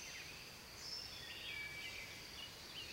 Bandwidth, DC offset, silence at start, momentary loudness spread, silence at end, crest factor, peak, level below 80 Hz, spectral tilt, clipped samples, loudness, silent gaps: 16 kHz; under 0.1%; 0 s; 5 LU; 0 s; 14 dB; -36 dBFS; -68 dBFS; -1 dB/octave; under 0.1%; -48 LUFS; none